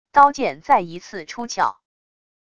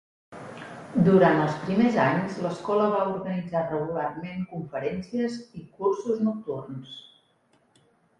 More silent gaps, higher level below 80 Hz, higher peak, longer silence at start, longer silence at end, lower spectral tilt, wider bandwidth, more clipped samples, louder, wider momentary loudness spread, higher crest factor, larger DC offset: neither; about the same, -58 dBFS vs -62 dBFS; first, 0 dBFS vs -6 dBFS; second, 0.15 s vs 0.3 s; second, 0.8 s vs 1.2 s; second, -3.5 dB/octave vs -8 dB/octave; second, 8 kHz vs 11 kHz; neither; first, -19 LUFS vs -26 LUFS; second, 17 LU vs 20 LU; about the same, 20 dB vs 20 dB; neither